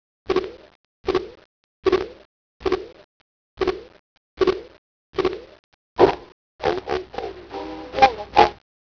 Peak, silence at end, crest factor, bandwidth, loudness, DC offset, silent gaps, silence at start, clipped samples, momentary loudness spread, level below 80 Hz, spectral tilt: 0 dBFS; 0.45 s; 24 dB; 5.4 kHz; -23 LUFS; under 0.1%; 0.75-1.04 s, 1.45-1.83 s, 2.25-2.60 s, 3.04-3.57 s, 3.99-4.37 s, 4.78-5.13 s, 5.59-5.96 s, 6.32-6.59 s; 0.3 s; under 0.1%; 17 LU; -48 dBFS; -5.5 dB/octave